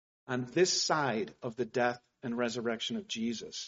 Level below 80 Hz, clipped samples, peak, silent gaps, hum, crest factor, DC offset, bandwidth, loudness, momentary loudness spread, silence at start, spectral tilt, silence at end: -74 dBFS; under 0.1%; -14 dBFS; none; none; 18 dB; under 0.1%; 8 kHz; -33 LUFS; 11 LU; 0.3 s; -3 dB/octave; 0 s